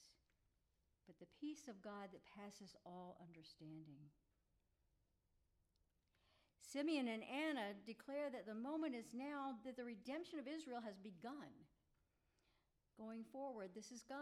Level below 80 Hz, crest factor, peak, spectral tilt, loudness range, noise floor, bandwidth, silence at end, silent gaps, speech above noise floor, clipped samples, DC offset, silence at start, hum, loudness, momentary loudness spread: -86 dBFS; 20 dB; -34 dBFS; -4.5 dB/octave; 16 LU; -85 dBFS; 13.5 kHz; 0 s; none; 34 dB; under 0.1%; under 0.1%; 0 s; none; -51 LUFS; 16 LU